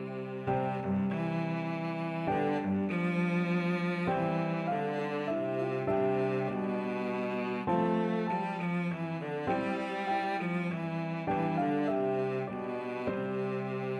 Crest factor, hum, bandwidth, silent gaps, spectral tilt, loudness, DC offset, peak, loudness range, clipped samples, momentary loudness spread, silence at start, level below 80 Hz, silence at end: 14 dB; none; 8.6 kHz; none; -8.5 dB/octave; -32 LUFS; under 0.1%; -18 dBFS; 2 LU; under 0.1%; 5 LU; 0 s; -66 dBFS; 0 s